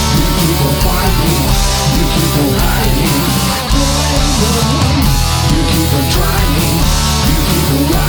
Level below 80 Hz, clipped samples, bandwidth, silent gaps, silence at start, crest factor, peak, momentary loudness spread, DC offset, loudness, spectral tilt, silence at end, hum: -16 dBFS; under 0.1%; over 20 kHz; none; 0 s; 12 dB; 0 dBFS; 1 LU; under 0.1%; -12 LUFS; -4.5 dB/octave; 0 s; none